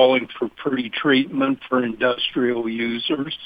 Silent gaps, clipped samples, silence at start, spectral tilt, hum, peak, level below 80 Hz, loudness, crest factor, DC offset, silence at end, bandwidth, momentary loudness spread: none; under 0.1%; 0 s; -7 dB/octave; none; -2 dBFS; -62 dBFS; -21 LUFS; 18 dB; under 0.1%; 0 s; 5 kHz; 6 LU